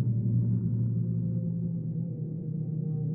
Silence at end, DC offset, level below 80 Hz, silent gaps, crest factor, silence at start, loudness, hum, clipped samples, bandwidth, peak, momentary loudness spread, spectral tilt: 0 s; under 0.1%; -56 dBFS; none; 12 dB; 0 s; -31 LUFS; none; under 0.1%; 1 kHz; -18 dBFS; 7 LU; -17.5 dB/octave